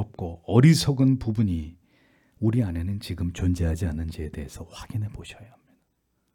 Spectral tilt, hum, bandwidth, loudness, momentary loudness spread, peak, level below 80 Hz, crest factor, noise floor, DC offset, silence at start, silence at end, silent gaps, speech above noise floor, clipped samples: -6.5 dB/octave; none; 18 kHz; -25 LUFS; 20 LU; -4 dBFS; -44 dBFS; 20 dB; -73 dBFS; under 0.1%; 0 s; 0.9 s; none; 49 dB; under 0.1%